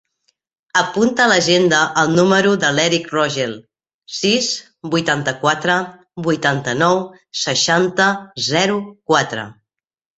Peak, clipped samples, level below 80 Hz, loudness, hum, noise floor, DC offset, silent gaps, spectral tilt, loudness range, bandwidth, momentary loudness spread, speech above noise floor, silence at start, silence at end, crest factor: 0 dBFS; under 0.1%; -58 dBFS; -16 LUFS; none; -67 dBFS; under 0.1%; 3.94-3.99 s; -3.5 dB/octave; 4 LU; 8.2 kHz; 11 LU; 50 dB; 0.75 s; 0.65 s; 18 dB